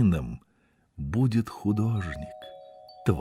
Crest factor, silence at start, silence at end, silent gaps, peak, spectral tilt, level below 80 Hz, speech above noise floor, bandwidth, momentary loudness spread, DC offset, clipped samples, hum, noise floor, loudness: 18 dB; 0 s; 0 s; none; -10 dBFS; -8.5 dB/octave; -48 dBFS; 40 dB; 13.5 kHz; 20 LU; under 0.1%; under 0.1%; none; -67 dBFS; -29 LUFS